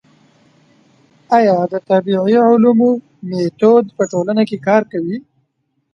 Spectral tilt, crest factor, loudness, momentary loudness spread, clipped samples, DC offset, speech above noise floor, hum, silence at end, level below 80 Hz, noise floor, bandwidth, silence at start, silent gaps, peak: -7 dB/octave; 14 dB; -14 LUFS; 11 LU; under 0.1%; under 0.1%; 54 dB; none; 0.75 s; -62 dBFS; -67 dBFS; 7.2 kHz; 1.3 s; none; 0 dBFS